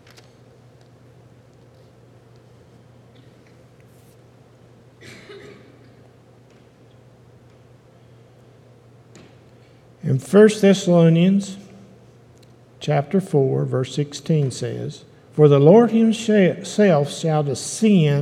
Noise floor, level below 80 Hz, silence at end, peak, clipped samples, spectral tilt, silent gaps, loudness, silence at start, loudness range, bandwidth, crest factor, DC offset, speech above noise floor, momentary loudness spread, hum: -50 dBFS; -66 dBFS; 0 s; 0 dBFS; under 0.1%; -7 dB/octave; none; -17 LUFS; 5.05 s; 6 LU; 13 kHz; 20 dB; under 0.1%; 33 dB; 18 LU; none